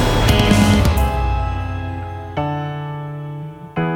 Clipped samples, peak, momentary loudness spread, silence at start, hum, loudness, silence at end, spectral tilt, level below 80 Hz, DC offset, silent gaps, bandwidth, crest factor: under 0.1%; 0 dBFS; 15 LU; 0 s; none; -19 LUFS; 0 s; -5.5 dB/octave; -24 dBFS; under 0.1%; none; 18 kHz; 16 dB